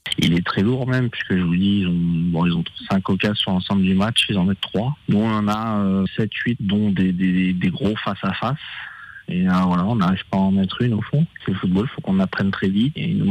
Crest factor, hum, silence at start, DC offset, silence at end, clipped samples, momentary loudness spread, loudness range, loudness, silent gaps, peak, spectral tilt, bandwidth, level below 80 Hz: 16 dB; none; 0.05 s; under 0.1%; 0 s; under 0.1%; 5 LU; 2 LU; -20 LUFS; none; -4 dBFS; -7 dB/octave; 11 kHz; -48 dBFS